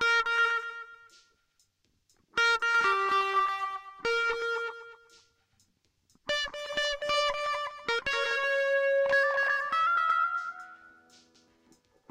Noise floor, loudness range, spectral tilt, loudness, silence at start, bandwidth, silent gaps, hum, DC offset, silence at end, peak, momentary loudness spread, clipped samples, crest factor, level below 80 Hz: -72 dBFS; 6 LU; -0.5 dB/octave; -28 LUFS; 0 s; 15 kHz; none; none; under 0.1%; 1.25 s; -16 dBFS; 13 LU; under 0.1%; 14 dB; -64 dBFS